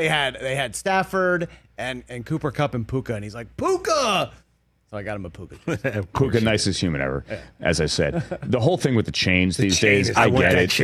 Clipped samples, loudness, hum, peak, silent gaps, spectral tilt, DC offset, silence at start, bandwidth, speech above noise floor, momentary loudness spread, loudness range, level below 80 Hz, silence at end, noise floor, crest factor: under 0.1%; -22 LUFS; none; -4 dBFS; none; -4.5 dB/octave; under 0.1%; 0 s; 14.5 kHz; 42 dB; 15 LU; 6 LU; -44 dBFS; 0 s; -64 dBFS; 20 dB